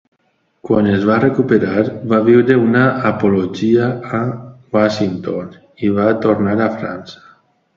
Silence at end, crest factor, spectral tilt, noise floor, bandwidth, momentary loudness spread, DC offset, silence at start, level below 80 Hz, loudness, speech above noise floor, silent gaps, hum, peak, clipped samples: 0.6 s; 16 dB; -8 dB/octave; -63 dBFS; 7.4 kHz; 12 LU; under 0.1%; 0.65 s; -50 dBFS; -15 LUFS; 48 dB; none; none; 0 dBFS; under 0.1%